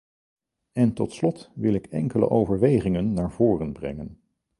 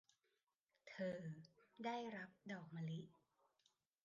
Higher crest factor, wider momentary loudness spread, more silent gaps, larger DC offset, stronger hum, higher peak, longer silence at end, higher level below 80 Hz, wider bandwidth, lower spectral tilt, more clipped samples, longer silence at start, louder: about the same, 18 dB vs 18 dB; about the same, 13 LU vs 14 LU; neither; neither; neither; first, -6 dBFS vs -36 dBFS; second, 0.45 s vs 0.95 s; first, -48 dBFS vs under -90 dBFS; first, 11.5 kHz vs 7.4 kHz; first, -9 dB/octave vs -7 dB/octave; neither; about the same, 0.75 s vs 0.85 s; first, -24 LUFS vs -51 LUFS